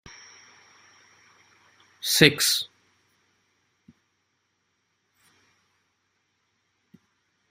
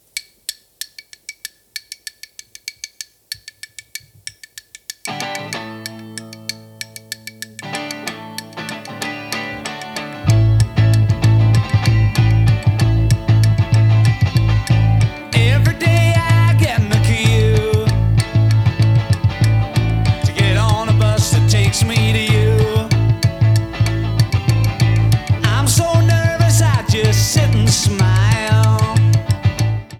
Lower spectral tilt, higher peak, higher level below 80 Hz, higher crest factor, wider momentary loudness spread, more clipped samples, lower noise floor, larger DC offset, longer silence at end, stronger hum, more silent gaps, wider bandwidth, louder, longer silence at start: second, -2.5 dB/octave vs -5.5 dB/octave; about the same, 0 dBFS vs -2 dBFS; second, -64 dBFS vs -30 dBFS; first, 30 dB vs 14 dB; first, 28 LU vs 18 LU; neither; first, -74 dBFS vs -40 dBFS; neither; first, 4.85 s vs 0 s; neither; neither; first, 16 kHz vs 14.5 kHz; second, -20 LUFS vs -15 LUFS; first, 2.05 s vs 0.15 s